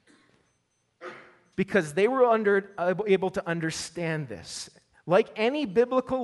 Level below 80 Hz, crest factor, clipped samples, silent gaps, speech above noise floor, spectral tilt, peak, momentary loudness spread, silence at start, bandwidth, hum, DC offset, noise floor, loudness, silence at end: -64 dBFS; 18 dB; under 0.1%; none; 47 dB; -5 dB/octave; -10 dBFS; 21 LU; 1 s; 11.5 kHz; none; under 0.1%; -73 dBFS; -26 LUFS; 0 s